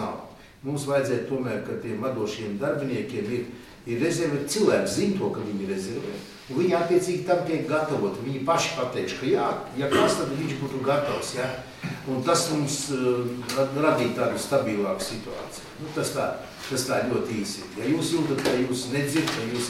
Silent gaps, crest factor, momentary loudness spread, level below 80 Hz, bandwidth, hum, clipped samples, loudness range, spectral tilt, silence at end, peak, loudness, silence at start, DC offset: none; 18 dB; 10 LU; -58 dBFS; 16.5 kHz; none; under 0.1%; 4 LU; -4.5 dB/octave; 0 s; -8 dBFS; -26 LUFS; 0 s; under 0.1%